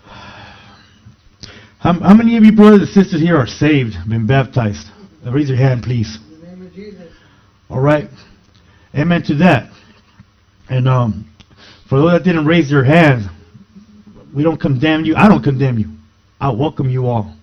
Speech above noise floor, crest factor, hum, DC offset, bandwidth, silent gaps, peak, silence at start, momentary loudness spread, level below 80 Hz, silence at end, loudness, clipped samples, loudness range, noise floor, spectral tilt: 37 dB; 14 dB; none; under 0.1%; 6.6 kHz; none; 0 dBFS; 0.1 s; 17 LU; -42 dBFS; 0.1 s; -13 LUFS; 0.3%; 8 LU; -49 dBFS; -8 dB/octave